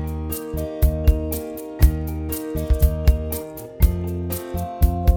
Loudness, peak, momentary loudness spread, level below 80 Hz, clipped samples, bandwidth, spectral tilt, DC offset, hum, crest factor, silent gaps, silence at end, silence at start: -23 LUFS; -2 dBFS; 9 LU; -22 dBFS; under 0.1%; 20 kHz; -7 dB/octave; under 0.1%; none; 18 dB; none; 0 s; 0 s